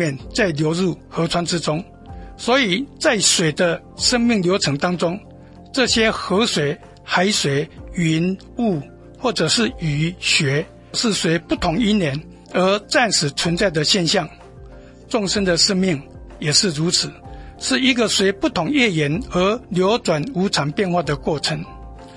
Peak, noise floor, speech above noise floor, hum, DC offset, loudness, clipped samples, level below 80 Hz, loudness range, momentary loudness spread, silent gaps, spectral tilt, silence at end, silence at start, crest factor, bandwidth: -2 dBFS; -40 dBFS; 21 dB; none; under 0.1%; -19 LUFS; under 0.1%; -42 dBFS; 2 LU; 10 LU; none; -3.5 dB/octave; 0 s; 0 s; 18 dB; 11.5 kHz